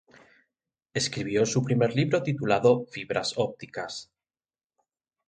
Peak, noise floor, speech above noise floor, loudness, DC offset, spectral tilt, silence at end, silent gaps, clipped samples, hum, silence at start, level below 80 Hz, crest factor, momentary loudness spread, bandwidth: -8 dBFS; under -90 dBFS; over 64 dB; -27 LUFS; under 0.1%; -5 dB/octave; 1.25 s; none; under 0.1%; none; 0.95 s; -64 dBFS; 20 dB; 13 LU; 9.4 kHz